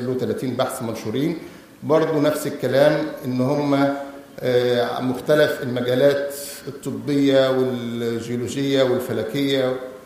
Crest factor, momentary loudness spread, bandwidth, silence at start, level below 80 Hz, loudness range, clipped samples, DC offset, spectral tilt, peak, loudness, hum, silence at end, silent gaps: 18 dB; 11 LU; 15.5 kHz; 0 s; -60 dBFS; 1 LU; under 0.1%; under 0.1%; -5.5 dB/octave; -4 dBFS; -21 LUFS; none; 0 s; none